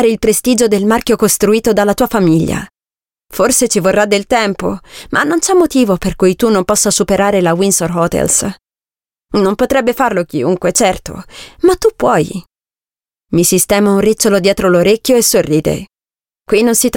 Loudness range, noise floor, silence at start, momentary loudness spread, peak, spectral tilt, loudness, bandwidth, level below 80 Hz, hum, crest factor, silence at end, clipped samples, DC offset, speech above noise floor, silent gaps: 3 LU; under -90 dBFS; 0 s; 8 LU; 0 dBFS; -4 dB/octave; -12 LUFS; 17 kHz; -38 dBFS; none; 12 dB; 0 s; under 0.1%; under 0.1%; over 78 dB; none